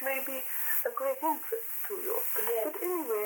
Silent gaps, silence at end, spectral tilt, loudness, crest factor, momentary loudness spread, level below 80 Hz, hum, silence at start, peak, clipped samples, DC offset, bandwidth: none; 0 s; -1 dB/octave; -30 LUFS; 22 dB; 5 LU; under -90 dBFS; none; 0 s; -10 dBFS; under 0.1%; under 0.1%; 19 kHz